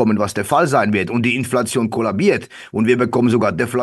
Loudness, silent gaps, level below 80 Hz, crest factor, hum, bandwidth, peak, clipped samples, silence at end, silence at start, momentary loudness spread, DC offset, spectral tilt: -17 LUFS; none; -48 dBFS; 16 dB; none; 12.5 kHz; -2 dBFS; under 0.1%; 0 s; 0 s; 4 LU; under 0.1%; -6 dB/octave